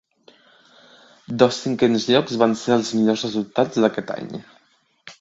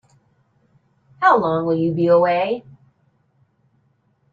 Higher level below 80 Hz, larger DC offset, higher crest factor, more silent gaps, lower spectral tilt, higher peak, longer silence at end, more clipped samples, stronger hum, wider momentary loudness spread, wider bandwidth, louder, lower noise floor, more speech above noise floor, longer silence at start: about the same, -64 dBFS vs -64 dBFS; neither; about the same, 22 dB vs 18 dB; neither; second, -5 dB/octave vs -8.5 dB/octave; first, 0 dBFS vs -4 dBFS; second, 0.1 s vs 1.7 s; neither; neither; first, 13 LU vs 7 LU; first, 7.8 kHz vs 6.8 kHz; about the same, -20 LUFS vs -18 LUFS; about the same, -62 dBFS vs -63 dBFS; about the same, 42 dB vs 45 dB; about the same, 1.3 s vs 1.2 s